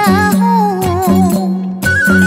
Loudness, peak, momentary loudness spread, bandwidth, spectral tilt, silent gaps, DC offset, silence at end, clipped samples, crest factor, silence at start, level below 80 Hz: -12 LUFS; -2 dBFS; 5 LU; 16.5 kHz; -6 dB/octave; none; under 0.1%; 0 s; under 0.1%; 10 dB; 0 s; -38 dBFS